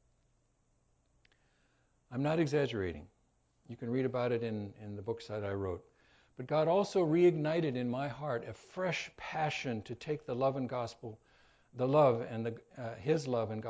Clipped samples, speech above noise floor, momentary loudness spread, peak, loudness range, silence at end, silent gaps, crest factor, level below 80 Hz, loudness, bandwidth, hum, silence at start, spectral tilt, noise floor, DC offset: under 0.1%; 40 dB; 17 LU; -16 dBFS; 6 LU; 0 s; none; 20 dB; -64 dBFS; -34 LUFS; 8 kHz; none; 2.1 s; -7 dB/octave; -74 dBFS; under 0.1%